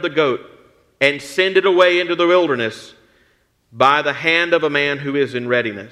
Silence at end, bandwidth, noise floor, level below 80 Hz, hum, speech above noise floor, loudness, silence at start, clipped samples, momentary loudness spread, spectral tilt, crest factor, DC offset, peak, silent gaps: 0.05 s; 12.5 kHz; -60 dBFS; -64 dBFS; none; 43 dB; -16 LUFS; 0 s; under 0.1%; 7 LU; -4.5 dB/octave; 18 dB; under 0.1%; 0 dBFS; none